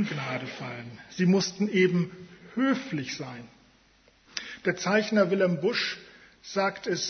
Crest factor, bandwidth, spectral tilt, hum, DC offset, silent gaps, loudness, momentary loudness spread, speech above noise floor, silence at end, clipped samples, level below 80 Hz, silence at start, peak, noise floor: 20 dB; 6.6 kHz; -5 dB/octave; none; under 0.1%; none; -28 LUFS; 17 LU; 34 dB; 0 s; under 0.1%; -68 dBFS; 0 s; -10 dBFS; -61 dBFS